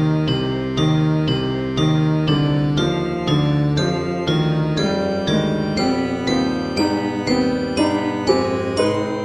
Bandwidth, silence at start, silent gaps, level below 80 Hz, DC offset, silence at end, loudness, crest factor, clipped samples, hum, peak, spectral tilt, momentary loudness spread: 10 kHz; 0 s; none; -42 dBFS; under 0.1%; 0 s; -19 LUFS; 16 dB; under 0.1%; none; -2 dBFS; -6.5 dB/octave; 3 LU